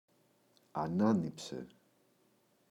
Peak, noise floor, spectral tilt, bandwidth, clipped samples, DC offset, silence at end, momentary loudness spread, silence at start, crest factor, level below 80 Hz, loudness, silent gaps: -18 dBFS; -72 dBFS; -7 dB/octave; 12 kHz; under 0.1%; under 0.1%; 1.05 s; 16 LU; 0.75 s; 20 dB; -72 dBFS; -35 LUFS; none